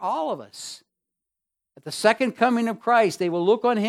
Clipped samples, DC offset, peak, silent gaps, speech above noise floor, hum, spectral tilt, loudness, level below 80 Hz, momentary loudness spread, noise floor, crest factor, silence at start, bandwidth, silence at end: under 0.1%; under 0.1%; -4 dBFS; none; 63 dB; none; -4.5 dB/octave; -22 LUFS; -78 dBFS; 17 LU; -85 dBFS; 20 dB; 0 s; 15 kHz; 0 s